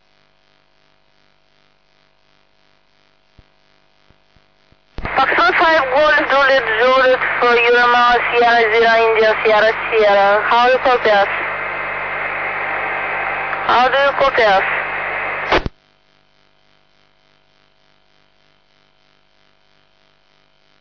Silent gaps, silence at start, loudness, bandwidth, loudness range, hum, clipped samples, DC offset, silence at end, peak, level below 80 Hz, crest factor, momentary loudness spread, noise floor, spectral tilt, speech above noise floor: none; 5 s; -14 LUFS; 5.4 kHz; 9 LU; 50 Hz at -50 dBFS; under 0.1%; 0.1%; 5.1 s; -6 dBFS; -44 dBFS; 12 dB; 9 LU; -58 dBFS; -4 dB/octave; 45 dB